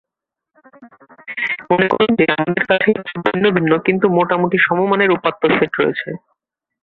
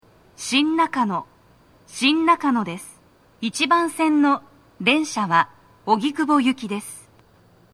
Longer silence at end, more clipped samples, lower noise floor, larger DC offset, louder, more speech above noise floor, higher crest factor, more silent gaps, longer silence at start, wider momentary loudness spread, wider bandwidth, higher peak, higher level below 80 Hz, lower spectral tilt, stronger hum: about the same, 0.65 s vs 0.75 s; neither; first, -83 dBFS vs -54 dBFS; neither; first, -16 LUFS vs -21 LUFS; first, 68 dB vs 34 dB; about the same, 16 dB vs 18 dB; neither; first, 0.8 s vs 0.4 s; second, 7 LU vs 14 LU; second, 4.6 kHz vs 14 kHz; first, 0 dBFS vs -4 dBFS; first, -56 dBFS vs -66 dBFS; first, -8.5 dB/octave vs -3.5 dB/octave; neither